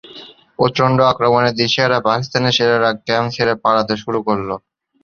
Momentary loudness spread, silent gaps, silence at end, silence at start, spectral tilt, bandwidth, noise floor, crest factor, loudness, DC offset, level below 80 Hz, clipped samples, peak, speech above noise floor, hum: 7 LU; none; 0.45 s; 0.1 s; -5 dB/octave; 7.2 kHz; -39 dBFS; 16 dB; -16 LUFS; under 0.1%; -52 dBFS; under 0.1%; 0 dBFS; 24 dB; none